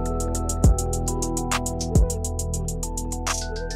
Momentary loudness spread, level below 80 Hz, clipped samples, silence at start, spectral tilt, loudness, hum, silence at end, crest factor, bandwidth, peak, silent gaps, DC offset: 7 LU; -26 dBFS; under 0.1%; 0 s; -4.5 dB/octave; -25 LUFS; none; 0 s; 16 dB; 16 kHz; -8 dBFS; none; under 0.1%